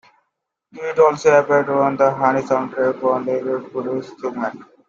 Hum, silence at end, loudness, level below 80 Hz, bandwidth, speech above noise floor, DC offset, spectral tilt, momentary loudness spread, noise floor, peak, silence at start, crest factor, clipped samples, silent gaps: none; 0.25 s; -18 LUFS; -64 dBFS; 7.6 kHz; 58 dB; under 0.1%; -6 dB/octave; 12 LU; -76 dBFS; -2 dBFS; 0.75 s; 16 dB; under 0.1%; none